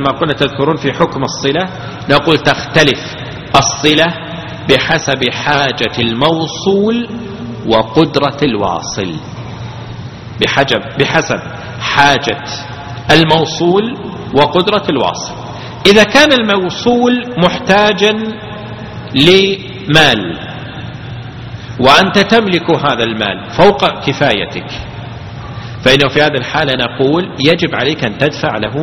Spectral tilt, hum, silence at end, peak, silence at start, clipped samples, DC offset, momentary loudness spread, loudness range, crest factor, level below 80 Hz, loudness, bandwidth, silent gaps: -4.5 dB/octave; none; 0 s; 0 dBFS; 0 s; 0.5%; under 0.1%; 18 LU; 4 LU; 12 dB; -40 dBFS; -11 LUFS; 17 kHz; none